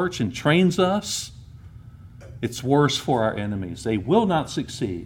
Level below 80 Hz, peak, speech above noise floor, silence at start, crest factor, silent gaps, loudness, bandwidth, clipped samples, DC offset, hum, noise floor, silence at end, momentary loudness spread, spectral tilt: -50 dBFS; -6 dBFS; 21 dB; 0 s; 18 dB; none; -23 LUFS; 17.5 kHz; under 0.1%; under 0.1%; none; -43 dBFS; 0 s; 10 LU; -5.5 dB/octave